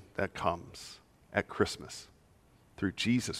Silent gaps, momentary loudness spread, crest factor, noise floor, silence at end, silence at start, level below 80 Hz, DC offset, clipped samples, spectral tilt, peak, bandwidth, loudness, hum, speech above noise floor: none; 16 LU; 24 dB; -63 dBFS; 0 s; 0 s; -62 dBFS; under 0.1%; under 0.1%; -4.5 dB/octave; -12 dBFS; 15.5 kHz; -34 LUFS; none; 30 dB